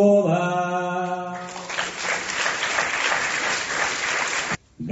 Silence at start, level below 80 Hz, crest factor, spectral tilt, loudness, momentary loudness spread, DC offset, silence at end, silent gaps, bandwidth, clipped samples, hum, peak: 0 s; -58 dBFS; 16 dB; -3.5 dB/octave; -23 LUFS; 8 LU; under 0.1%; 0 s; none; 8.2 kHz; under 0.1%; none; -6 dBFS